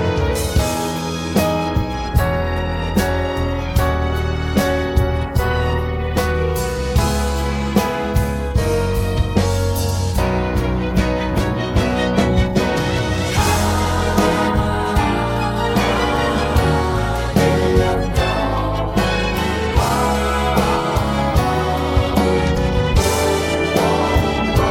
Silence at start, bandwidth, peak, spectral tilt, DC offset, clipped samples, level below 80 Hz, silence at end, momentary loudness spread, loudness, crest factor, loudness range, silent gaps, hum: 0 s; 17 kHz; -2 dBFS; -5.5 dB/octave; under 0.1%; under 0.1%; -24 dBFS; 0 s; 4 LU; -18 LUFS; 16 dB; 2 LU; none; none